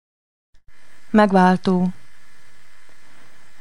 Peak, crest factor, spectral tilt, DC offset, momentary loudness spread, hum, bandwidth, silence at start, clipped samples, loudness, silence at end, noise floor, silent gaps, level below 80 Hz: -2 dBFS; 20 dB; -7.5 dB/octave; 3%; 7 LU; none; 11 kHz; 0.5 s; under 0.1%; -17 LUFS; 1.7 s; -54 dBFS; none; -58 dBFS